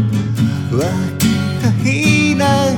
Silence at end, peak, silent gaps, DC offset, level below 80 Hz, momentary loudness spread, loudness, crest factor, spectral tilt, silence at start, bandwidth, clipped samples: 0 s; 0 dBFS; none; under 0.1%; -46 dBFS; 5 LU; -15 LUFS; 14 dB; -5.5 dB/octave; 0 s; 19 kHz; under 0.1%